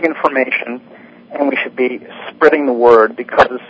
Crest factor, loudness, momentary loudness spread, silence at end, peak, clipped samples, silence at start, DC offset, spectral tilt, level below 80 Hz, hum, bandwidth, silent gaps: 14 dB; -13 LUFS; 18 LU; 0.05 s; 0 dBFS; 0.5%; 0 s; under 0.1%; -6 dB/octave; -52 dBFS; none; 8 kHz; none